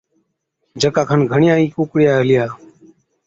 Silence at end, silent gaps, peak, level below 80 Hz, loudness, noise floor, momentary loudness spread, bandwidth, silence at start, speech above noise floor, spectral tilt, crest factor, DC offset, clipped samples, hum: 0.7 s; none; -2 dBFS; -54 dBFS; -15 LUFS; -70 dBFS; 6 LU; 8 kHz; 0.75 s; 55 dB; -6.5 dB/octave; 14 dB; under 0.1%; under 0.1%; none